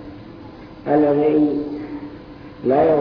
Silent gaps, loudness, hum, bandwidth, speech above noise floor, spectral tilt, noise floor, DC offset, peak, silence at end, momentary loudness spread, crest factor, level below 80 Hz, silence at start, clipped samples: none; -18 LUFS; none; 5.4 kHz; 22 dB; -10 dB/octave; -38 dBFS; under 0.1%; -6 dBFS; 0 s; 23 LU; 14 dB; -50 dBFS; 0 s; under 0.1%